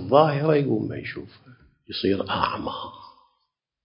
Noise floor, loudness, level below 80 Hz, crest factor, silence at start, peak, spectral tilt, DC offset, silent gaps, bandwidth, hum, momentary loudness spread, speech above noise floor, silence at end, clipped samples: -76 dBFS; -24 LUFS; -54 dBFS; 22 dB; 0 s; -4 dBFS; -11 dB/octave; under 0.1%; none; 5.6 kHz; none; 16 LU; 53 dB; 0.75 s; under 0.1%